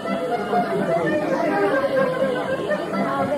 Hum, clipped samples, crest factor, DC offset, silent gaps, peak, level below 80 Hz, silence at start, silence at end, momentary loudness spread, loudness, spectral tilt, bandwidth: none; under 0.1%; 14 dB; under 0.1%; none; -8 dBFS; -56 dBFS; 0 s; 0 s; 4 LU; -22 LUFS; -6.5 dB/octave; 15 kHz